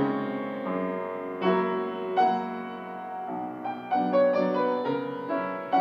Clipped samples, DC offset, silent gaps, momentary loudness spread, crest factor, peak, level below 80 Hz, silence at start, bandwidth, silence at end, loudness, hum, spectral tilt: under 0.1%; under 0.1%; none; 11 LU; 16 dB; -12 dBFS; -82 dBFS; 0 s; 6.6 kHz; 0 s; -28 LUFS; none; -8.5 dB/octave